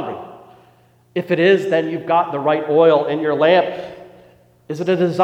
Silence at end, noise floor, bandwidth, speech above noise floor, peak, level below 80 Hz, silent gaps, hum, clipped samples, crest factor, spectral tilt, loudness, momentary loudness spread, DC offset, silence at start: 0 s; -53 dBFS; 8.6 kHz; 37 dB; -2 dBFS; -66 dBFS; none; none; under 0.1%; 16 dB; -7 dB/octave; -17 LUFS; 16 LU; under 0.1%; 0 s